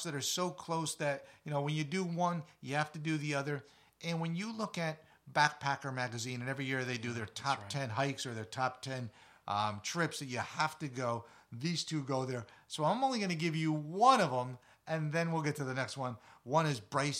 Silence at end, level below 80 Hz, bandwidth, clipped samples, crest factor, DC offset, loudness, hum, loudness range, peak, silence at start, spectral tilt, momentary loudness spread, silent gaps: 0 s; -78 dBFS; 15 kHz; under 0.1%; 24 dB; under 0.1%; -36 LUFS; none; 5 LU; -12 dBFS; 0 s; -4.5 dB/octave; 11 LU; none